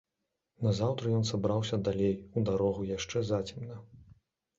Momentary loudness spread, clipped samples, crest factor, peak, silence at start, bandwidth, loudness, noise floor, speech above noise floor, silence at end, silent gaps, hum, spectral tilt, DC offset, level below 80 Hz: 8 LU; under 0.1%; 16 dB; -16 dBFS; 0.6 s; 7.8 kHz; -32 LUFS; -85 dBFS; 54 dB; 0.55 s; none; none; -6.5 dB/octave; under 0.1%; -56 dBFS